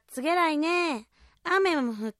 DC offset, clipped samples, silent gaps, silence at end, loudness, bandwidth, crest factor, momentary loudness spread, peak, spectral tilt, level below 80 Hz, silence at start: under 0.1%; under 0.1%; none; 0.1 s; -26 LUFS; 14 kHz; 16 dB; 9 LU; -12 dBFS; -3.5 dB/octave; -68 dBFS; 0.1 s